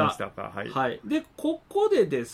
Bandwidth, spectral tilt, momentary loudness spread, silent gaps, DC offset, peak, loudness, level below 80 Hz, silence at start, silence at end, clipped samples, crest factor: 14 kHz; -5.5 dB/octave; 11 LU; none; under 0.1%; -10 dBFS; -27 LUFS; -60 dBFS; 0 s; 0 s; under 0.1%; 16 dB